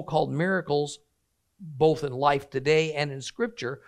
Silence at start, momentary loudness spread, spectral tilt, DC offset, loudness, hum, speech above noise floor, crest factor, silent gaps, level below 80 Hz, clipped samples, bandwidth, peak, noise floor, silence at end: 0 s; 8 LU; -5.5 dB/octave; under 0.1%; -26 LUFS; none; 49 dB; 20 dB; none; -60 dBFS; under 0.1%; 10 kHz; -8 dBFS; -75 dBFS; 0.1 s